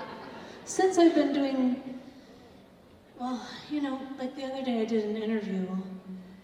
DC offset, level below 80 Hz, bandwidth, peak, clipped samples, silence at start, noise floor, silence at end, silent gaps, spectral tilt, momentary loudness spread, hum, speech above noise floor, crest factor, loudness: under 0.1%; -70 dBFS; 11.5 kHz; -10 dBFS; under 0.1%; 0 s; -55 dBFS; 0 s; none; -5 dB/octave; 20 LU; none; 27 dB; 20 dB; -29 LUFS